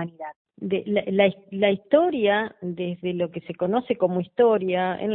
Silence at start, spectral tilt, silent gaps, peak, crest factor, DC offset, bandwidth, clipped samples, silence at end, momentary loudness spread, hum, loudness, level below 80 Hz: 0 s; -11 dB/octave; 0.36-0.45 s; -6 dBFS; 18 dB; under 0.1%; 4.1 kHz; under 0.1%; 0 s; 11 LU; none; -23 LUFS; -66 dBFS